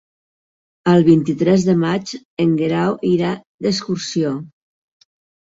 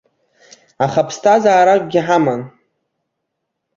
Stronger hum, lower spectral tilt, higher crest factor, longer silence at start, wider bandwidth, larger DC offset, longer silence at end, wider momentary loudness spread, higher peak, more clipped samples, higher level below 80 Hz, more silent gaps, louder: neither; about the same, -6.5 dB/octave vs -5.5 dB/octave; about the same, 16 dB vs 16 dB; about the same, 0.85 s vs 0.8 s; about the same, 7.8 kHz vs 7.6 kHz; neither; second, 0.95 s vs 1.3 s; about the same, 9 LU vs 9 LU; about the same, -2 dBFS vs 0 dBFS; neither; about the same, -56 dBFS vs -60 dBFS; first, 2.25-2.37 s, 3.46-3.59 s vs none; second, -17 LUFS vs -14 LUFS